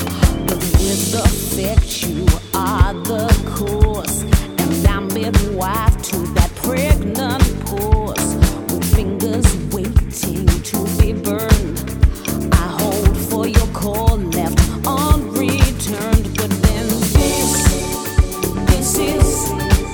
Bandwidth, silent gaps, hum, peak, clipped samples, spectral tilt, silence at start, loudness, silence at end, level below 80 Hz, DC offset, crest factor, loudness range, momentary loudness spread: over 20 kHz; none; none; 0 dBFS; under 0.1%; -5 dB/octave; 0 s; -17 LUFS; 0 s; -20 dBFS; under 0.1%; 16 dB; 1 LU; 4 LU